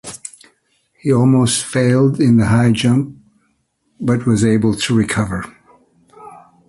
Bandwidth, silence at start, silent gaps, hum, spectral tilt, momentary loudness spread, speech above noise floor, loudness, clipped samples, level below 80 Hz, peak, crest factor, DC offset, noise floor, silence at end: 11.5 kHz; 0.05 s; none; none; -6 dB/octave; 15 LU; 50 dB; -15 LUFS; under 0.1%; -44 dBFS; -2 dBFS; 14 dB; under 0.1%; -64 dBFS; 0.35 s